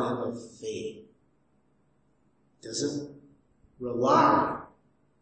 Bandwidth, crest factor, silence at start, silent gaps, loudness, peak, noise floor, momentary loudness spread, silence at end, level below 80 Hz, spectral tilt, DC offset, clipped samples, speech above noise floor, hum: 8.8 kHz; 22 dB; 0 s; none; -28 LUFS; -10 dBFS; -69 dBFS; 19 LU; 0.55 s; -64 dBFS; -5 dB/octave; under 0.1%; under 0.1%; 44 dB; none